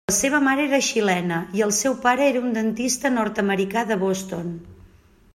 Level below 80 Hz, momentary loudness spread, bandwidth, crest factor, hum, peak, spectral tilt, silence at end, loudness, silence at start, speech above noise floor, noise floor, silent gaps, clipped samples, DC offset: -56 dBFS; 7 LU; 16 kHz; 16 dB; none; -6 dBFS; -3.5 dB/octave; 0.6 s; -21 LUFS; 0.1 s; 31 dB; -53 dBFS; none; under 0.1%; under 0.1%